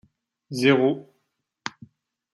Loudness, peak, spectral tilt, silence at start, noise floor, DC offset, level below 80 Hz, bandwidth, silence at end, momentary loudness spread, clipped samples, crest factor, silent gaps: -22 LUFS; -6 dBFS; -5.5 dB/octave; 0.5 s; -75 dBFS; under 0.1%; -72 dBFS; 12.5 kHz; 0.65 s; 18 LU; under 0.1%; 22 dB; none